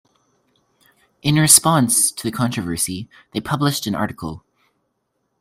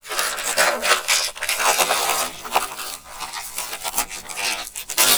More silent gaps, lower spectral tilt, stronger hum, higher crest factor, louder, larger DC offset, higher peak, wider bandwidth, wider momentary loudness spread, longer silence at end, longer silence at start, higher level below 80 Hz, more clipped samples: neither; first, -3.5 dB/octave vs 1 dB/octave; neither; about the same, 20 dB vs 22 dB; first, -17 LUFS vs -21 LUFS; second, under 0.1% vs 0.3%; about the same, 0 dBFS vs 0 dBFS; second, 16 kHz vs over 20 kHz; first, 18 LU vs 12 LU; first, 1 s vs 0 s; first, 1.25 s vs 0.05 s; about the same, -54 dBFS vs -52 dBFS; neither